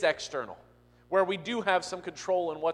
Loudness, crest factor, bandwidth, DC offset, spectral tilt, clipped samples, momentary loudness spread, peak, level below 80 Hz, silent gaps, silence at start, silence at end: -30 LUFS; 20 dB; 11 kHz; under 0.1%; -3.5 dB/octave; under 0.1%; 10 LU; -10 dBFS; -68 dBFS; none; 0 s; 0 s